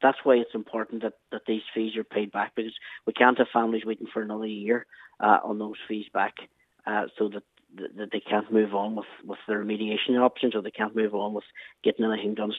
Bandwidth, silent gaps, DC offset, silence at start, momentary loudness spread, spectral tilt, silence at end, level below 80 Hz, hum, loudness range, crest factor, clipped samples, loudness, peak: 4.1 kHz; none; under 0.1%; 0 s; 14 LU; -7.5 dB/octave; 0 s; -80 dBFS; none; 4 LU; 24 dB; under 0.1%; -27 LUFS; -4 dBFS